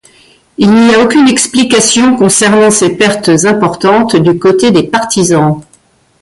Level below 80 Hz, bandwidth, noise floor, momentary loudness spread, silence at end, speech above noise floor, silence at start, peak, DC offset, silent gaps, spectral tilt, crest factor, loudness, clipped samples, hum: -44 dBFS; 11.5 kHz; -48 dBFS; 4 LU; 0.6 s; 41 dB; 0.6 s; 0 dBFS; under 0.1%; none; -4 dB/octave; 8 dB; -7 LUFS; under 0.1%; none